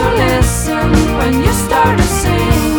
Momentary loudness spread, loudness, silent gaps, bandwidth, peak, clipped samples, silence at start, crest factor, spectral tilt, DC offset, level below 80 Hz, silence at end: 2 LU; -12 LUFS; none; 19.5 kHz; 0 dBFS; under 0.1%; 0 s; 12 dB; -5 dB/octave; under 0.1%; -20 dBFS; 0 s